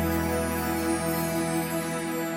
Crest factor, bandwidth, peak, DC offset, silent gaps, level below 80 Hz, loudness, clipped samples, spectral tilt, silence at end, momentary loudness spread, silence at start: 14 dB; 16.5 kHz; -14 dBFS; under 0.1%; none; -44 dBFS; -28 LUFS; under 0.1%; -5 dB/octave; 0 s; 3 LU; 0 s